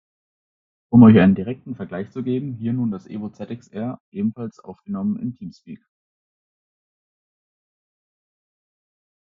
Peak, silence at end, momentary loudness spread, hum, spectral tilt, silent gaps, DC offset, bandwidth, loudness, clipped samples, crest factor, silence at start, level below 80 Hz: 0 dBFS; 3.6 s; 22 LU; none; -8.5 dB/octave; 4.00-4.12 s; under 0.1%; 5.6 kHz; -19 LUFS; under 0.1%; 22 dB; 0.9 s; -60 dBFS